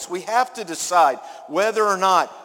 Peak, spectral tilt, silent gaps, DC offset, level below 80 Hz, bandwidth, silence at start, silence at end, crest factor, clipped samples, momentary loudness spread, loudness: -4 dBFS; -2 dB/octave; none; under 0.1%; -74 dBFS; 17 kHz; 0 s; 0 s; 18 dB; under 0.1%; 9 LU; -20 LUFS